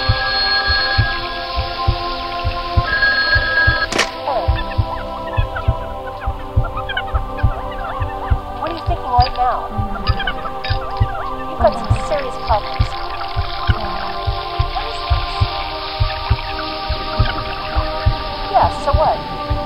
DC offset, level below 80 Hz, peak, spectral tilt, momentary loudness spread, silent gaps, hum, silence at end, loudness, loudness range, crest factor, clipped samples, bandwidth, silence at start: under 0.1%; -24 dBFS; 0 dBFS; -5 dB/octave; 9 LU; none; none; 0 s; -19 LUFS; 5 LU; 18 dB; under 0.1%; 15 kHz; 0 s